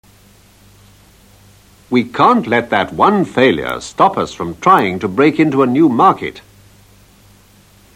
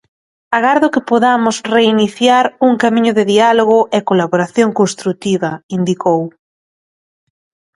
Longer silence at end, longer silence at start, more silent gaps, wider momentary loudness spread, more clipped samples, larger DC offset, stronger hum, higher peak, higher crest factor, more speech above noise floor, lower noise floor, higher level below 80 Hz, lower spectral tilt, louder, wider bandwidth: about the same, 1.55 s vs 1.45 s; first, 1.9 s vs 0.5 s; second, none vs 5.63-5.69 s; about the same, 9 LU vs 7 LU; neither; neither; first, 50 Hz at -45 dBFS vs none; about the same, 0 dBFS vs 0 dBFS; about the same, 16 dB vs 14 dB; second, 34 dB vs over 78 dB; second, -47 dBFS vs under -90 dBFS; first, -50 dBFS vs -58 dBFS; about the same, -6 dB/octave vs -5 dB/octave; about the same, -13 LUFS vs -13 LUFS; first, 16 kHz vs 11.5 kHz